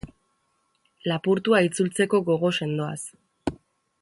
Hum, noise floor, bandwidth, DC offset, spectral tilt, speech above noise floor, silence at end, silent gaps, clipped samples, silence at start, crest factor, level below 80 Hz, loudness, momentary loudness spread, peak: none; -71 dBFS; 11.5 kHz; under 0.1%; -5 dB/octave; 48 dB; 0.45 s; none; under 0.1%; 0.05 s; 20 dB; -56 dBFS; -24 LUFS; 13 LU; -6 dBFS